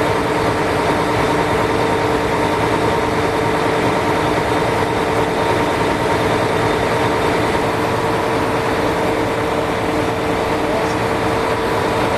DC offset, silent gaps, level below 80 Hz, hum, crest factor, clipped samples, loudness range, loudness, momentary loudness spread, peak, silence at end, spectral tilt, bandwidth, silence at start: 0.2%; none; -36 dBFS; none; 12 dB; under 0.1%; 1 LU; -17 LUFS; 2 LU; -4 dBFS; 0 s; -5.5 dB/octave; 14 kHz; 0 s